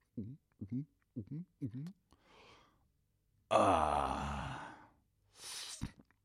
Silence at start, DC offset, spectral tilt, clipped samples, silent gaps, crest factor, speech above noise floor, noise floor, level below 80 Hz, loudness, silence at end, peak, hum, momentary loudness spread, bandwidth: 0.15 s; under 0.1%; -5 dB/octave; under 0.1%; none; 24 dB; 42 dB; -78 dBFS; -56 dBFS; -38 LUFS; 0.3 s; -18 dBFS; none; 20 LU; 15 kHz